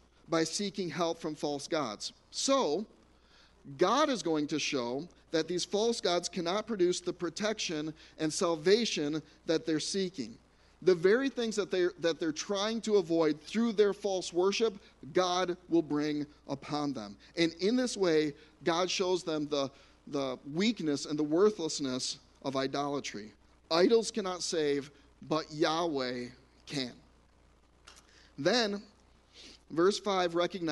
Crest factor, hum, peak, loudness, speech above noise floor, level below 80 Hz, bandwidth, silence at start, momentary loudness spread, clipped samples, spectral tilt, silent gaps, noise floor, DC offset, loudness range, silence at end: 20 dB; none; -12 dBFS; -32 LUFS; 32 dB; -66 dBFS; 11.5 kHz; 0.3 s; 11 LU; under 0.1%; -4 dB/octave; none; -64 dBFS; under 0.1%; 4 LU; 0 s